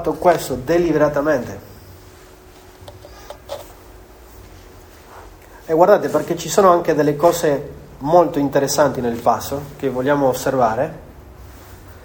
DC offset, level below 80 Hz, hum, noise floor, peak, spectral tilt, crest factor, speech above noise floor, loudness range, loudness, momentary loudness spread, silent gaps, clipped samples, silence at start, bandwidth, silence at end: under 0.1%; -44 dBFS; none; -43 dBFS; 0 dBFS; -5 dB/octave; 18 dB; 27 dB; 23 LU; -17 LUFS; 20 LU; none; under 0.1%; 0 s; over 20 kHz; 0 s